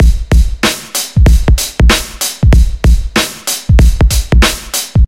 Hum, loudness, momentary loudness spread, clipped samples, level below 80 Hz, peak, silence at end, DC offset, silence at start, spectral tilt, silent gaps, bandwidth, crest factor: none; -11 LUFS; 5 LU; under 0.1%; -10 dBFS; 0 dBFS; 0 s; 0.7%; 0 s; -4 dB/octave; none; 16.5 kHz; 8 dB